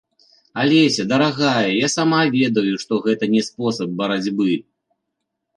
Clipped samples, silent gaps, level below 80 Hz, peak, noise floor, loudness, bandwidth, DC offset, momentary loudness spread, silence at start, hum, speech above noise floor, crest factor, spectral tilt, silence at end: under 0.1%; none; -64 dBFS; -4 dBFS; -77 dBFS; -18 LUFS; 11.5 kHz; under 0.1%; 7 LU; 0.55 s; none; 59 dB; 16 dB; -4.5 dB/octave; 0.95 s